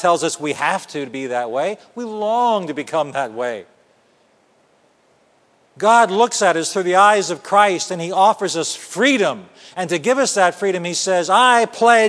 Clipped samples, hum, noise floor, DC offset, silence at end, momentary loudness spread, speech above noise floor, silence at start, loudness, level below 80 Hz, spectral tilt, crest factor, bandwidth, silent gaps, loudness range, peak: under 0.1%; none; -57 dBFS; under 0.1%; 0 s; 12 LU; 40 dB; 0 s; -17 LUFS; -74 dBFS; -3 dB/octave; 18 dB; 11 kHz; none; 8 LU; 0 dBFS